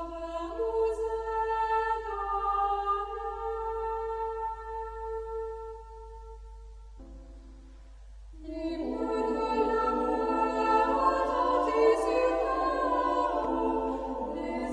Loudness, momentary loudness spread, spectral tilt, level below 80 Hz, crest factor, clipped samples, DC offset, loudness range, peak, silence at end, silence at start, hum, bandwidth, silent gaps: -30 LUFS; 20 LU; -6 dB/octave; -48 dBFS; 18 dB; under 0.1%; under 0.1%; 15 LU; -12 dBFS; 0 s; 0 s; none; 11 kHz; none